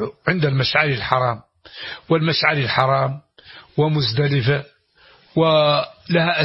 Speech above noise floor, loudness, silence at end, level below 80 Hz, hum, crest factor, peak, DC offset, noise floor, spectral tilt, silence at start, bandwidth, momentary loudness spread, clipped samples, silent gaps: 34 dB; -19 LUFS; 0 s; -52 dBFS; none; 18 dB; 0 dBFS; under 0.1%; -53 dBFS; -8.5 dB/octave; 0 s; 6 kHz; 11 LU; under 0.1%; none